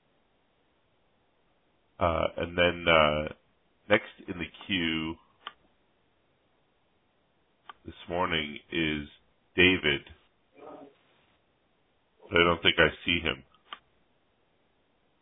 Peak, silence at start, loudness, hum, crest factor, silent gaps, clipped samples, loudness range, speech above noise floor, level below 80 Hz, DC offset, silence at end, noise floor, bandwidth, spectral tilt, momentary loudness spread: -6 dBFS; 2 s; -27 LUFS; none; 26 dB; none; under 0.1%; 9 LU; 44 dB; -54 dBFS; under 0.1%; 1.45 s; -71 dBFS; 4 kHz; -8 dB/octave; 25 LU